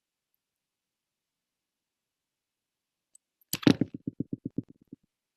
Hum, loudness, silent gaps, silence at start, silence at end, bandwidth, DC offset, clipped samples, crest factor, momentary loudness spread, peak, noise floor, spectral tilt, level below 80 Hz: none; -30 LUFS; none; 3.55 s; 0.75 s; 13.5 kHz; under 0.1%; under 0.1%; 30 dB; 14 LU; -6 dBFS; -88 dBFS; -5.5 dB/octave; -68 dBFS